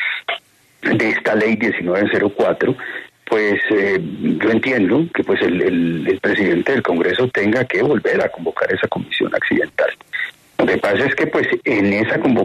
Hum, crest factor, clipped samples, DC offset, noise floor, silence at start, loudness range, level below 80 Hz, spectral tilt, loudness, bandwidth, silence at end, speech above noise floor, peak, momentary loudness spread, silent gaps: none; 14 dB; under 0.1%; under 0.1%; -39 dBFS; 0 s; 2 LU; -56 dBFS; -6.5 dB/octave; -17 LUFS; 13 kHz; 0 s; 22 dB; -4 dBFS; 5 LU; none